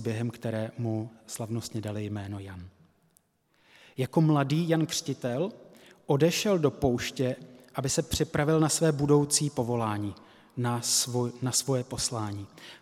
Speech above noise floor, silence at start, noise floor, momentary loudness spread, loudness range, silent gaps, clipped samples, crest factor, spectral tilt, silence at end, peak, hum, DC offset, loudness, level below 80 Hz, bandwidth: 40 dB; 0 s; -69 dBFS; 14 LU; 9 LU; none; under 0.1%; 18 dB; -4.5 dB/octave; 0.05 s; -10 dBFS; none; under 0.1%; -28 LUFS; -56 dBFS; 16 kHz